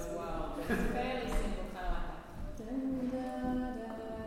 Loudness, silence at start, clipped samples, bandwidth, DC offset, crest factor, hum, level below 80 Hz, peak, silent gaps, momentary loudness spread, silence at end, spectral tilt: -38 LUFS; 0 s; under 0.1%; 16 kHz; under 0.1%; 14 dB; none; -42 dBFS; -22 dBFS; none; 8 LU; 0 s; -6 dB/octave